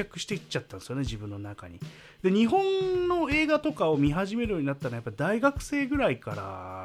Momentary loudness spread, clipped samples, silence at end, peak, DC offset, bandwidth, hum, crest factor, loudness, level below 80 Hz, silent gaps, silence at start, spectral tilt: 14 LU; under 0.1%; 0 s; -10 dBFS; under 0.1%; 14 kHz; none; 18 dB; -28 LUFS; -48 dBFS; none; 0 s; -6 dB/octave